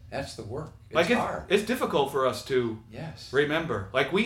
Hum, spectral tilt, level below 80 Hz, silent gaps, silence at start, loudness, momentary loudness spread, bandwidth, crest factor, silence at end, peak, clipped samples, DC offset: none; -5 dB/octave; -54 dBFS; none; 0 s; -27 LUFS; 13 LU; 16.5 kHz; 18 dB; 0 s; -10 dBFS; under 0.1%; under 0.1%